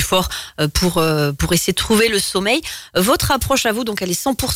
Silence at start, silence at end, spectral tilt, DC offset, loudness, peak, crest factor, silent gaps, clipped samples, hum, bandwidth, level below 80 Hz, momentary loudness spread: 0 s; 0 s; -3.5 dB/octave; under 0.1%; -17 LUFS; -4 dBFS; 12 dB; none; under 0.1%; none; 16.5 kHz; -32 dBFS; 6 LU